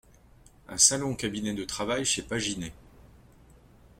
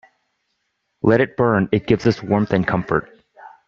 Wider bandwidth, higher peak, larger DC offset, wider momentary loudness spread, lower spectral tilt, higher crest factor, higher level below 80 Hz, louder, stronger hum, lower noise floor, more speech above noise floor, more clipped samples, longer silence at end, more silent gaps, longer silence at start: first, 16.5 kHz vs 7.4 kHz; second, -6 dBFS vs -2 dBFS; neither; first, 15 LU vs 5 LU; second, -2 dB/octave vs -6.5 dB/octave; first, 26 dB vs 18 dB; second, -54 dBFS vs -48 dBFS; second, -27 LUFS vs -19 LUFS; neither; second, -56 dBFS vs -72 dBFS; second, 28 dB vs 55 dB; neither; first, 1 s vs 0.2 s; neither; second, 0.7 s vs 1.05 s